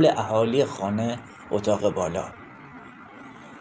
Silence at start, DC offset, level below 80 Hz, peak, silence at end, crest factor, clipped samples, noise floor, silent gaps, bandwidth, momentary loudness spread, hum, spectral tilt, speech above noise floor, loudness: 0 s; under 0.1%; -60 dBFS; -8 dBFS; 0 s; 18 dB; under 0.1%; -44 dBFS; none; 9.8 kHz; 22 LU; none; -6 dB/octave; 20 dB; -25 LUFS